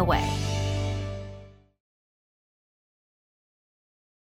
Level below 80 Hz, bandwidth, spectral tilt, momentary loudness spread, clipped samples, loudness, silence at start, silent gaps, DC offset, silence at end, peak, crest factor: -42 dBFS; 15.5 kHz; -5.5 dB/octave; 17 LU; under 0.1%; -29 LUFS; 0 s; none; under 0.1%; 2.85 s; -10 dBFS; 22 dB